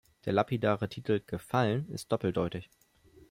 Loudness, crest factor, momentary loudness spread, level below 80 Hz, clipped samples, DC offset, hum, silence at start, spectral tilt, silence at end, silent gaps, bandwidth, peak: -32 LUFS; 20 dB; 5 LU; -62 dBFS; under 0.1%; under 0.1%; none; 0.25 s; -7 dB/octave; 0.65 s; none; 16.5 kHz; -12 dBFS